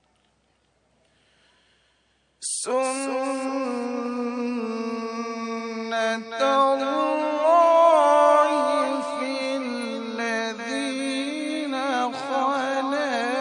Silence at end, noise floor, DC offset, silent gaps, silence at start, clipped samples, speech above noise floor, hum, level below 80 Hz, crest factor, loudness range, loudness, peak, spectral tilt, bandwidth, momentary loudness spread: 0 s; -67 dBFS; under 0.1%; none; 2.4 s; under 0.1%; 44 dB; none; -74 dBFS; 18 dB; 9 LU; -23 LUFS; -6 dBFS; -2.5 dB/octave; 10.5 kHz; 13 LU